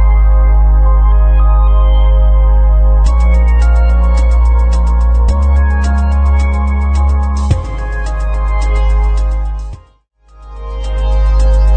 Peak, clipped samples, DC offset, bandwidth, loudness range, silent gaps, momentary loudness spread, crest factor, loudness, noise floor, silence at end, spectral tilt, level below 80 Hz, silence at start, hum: -2 dBFS; under 0.1%; under 0.1%; 8.2 kHz; 6 LU; none; 8 LU; 8 dB; -12 LUFS; -47 dBFS; 0 s; -7.5 dB/octave; -8 dBFS; 0 s; none